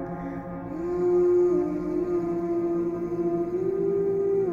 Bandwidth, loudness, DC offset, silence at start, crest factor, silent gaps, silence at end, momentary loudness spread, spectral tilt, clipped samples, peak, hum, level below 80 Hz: 6.8 kHz; -26 LUFS; under 0.1%; 0 s; 10 dB; none; 0 s; 12 LU; -10 dB/octave; under 0.1%; -14 dBFS; none; -52 dBFS